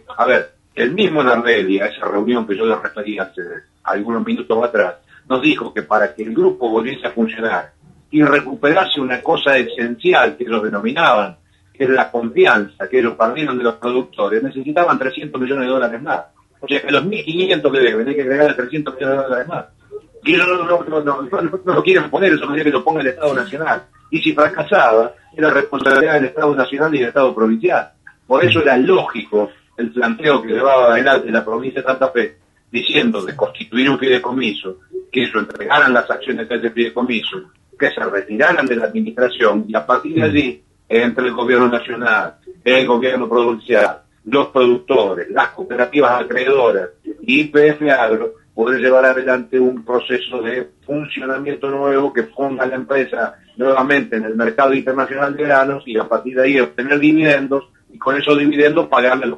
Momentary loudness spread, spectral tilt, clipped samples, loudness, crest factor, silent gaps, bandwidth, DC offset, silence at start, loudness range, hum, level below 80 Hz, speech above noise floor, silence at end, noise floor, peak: 9 LU; -6 dB/octave; under 0.1%; -16 LUFS; 16 dB; none; 9 kHz; under 0.1%; 0.1 s; 4 LU; none; -58 dBFS; 21 dB; 0 s; -36 dBFS; 0 dBFS